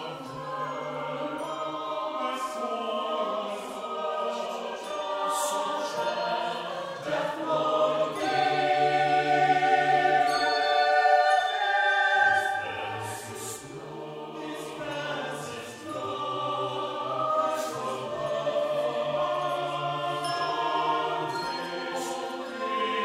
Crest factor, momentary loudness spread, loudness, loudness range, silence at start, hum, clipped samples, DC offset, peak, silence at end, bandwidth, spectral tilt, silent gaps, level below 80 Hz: 18 dB; 13 LU; -28 LUFS; 9 LU; 0 s; none; under 0.1%; under 0.1%; -10 dBFS; 0 s; 16 kHz; -3.5 dB/octave; none; -70 dBFS